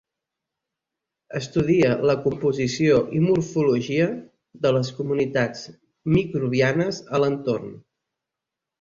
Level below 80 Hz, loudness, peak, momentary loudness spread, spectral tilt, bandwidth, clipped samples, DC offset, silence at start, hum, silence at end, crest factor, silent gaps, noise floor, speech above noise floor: -54 dBFS; -22 LUFS; -6 dBFS; 11 LU; -6.5 dB/octave; 7.8 kHz; under 0.1%; under 0.1%; 1.3 s; none; 1 s; 16 dB; none; -86 dBFS; 64 dB